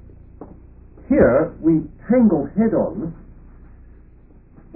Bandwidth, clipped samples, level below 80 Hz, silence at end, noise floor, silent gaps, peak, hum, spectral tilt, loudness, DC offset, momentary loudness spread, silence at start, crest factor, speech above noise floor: 2.7 kHz; under 0.1%; -42 dBFS; 1.55 s; -47 dBFS; none; -2 dBFS; none; -15.5 dB/octave; -18 LUFS; 0.1%; 9 LU; 0.4 s; 18 dB; 30 dB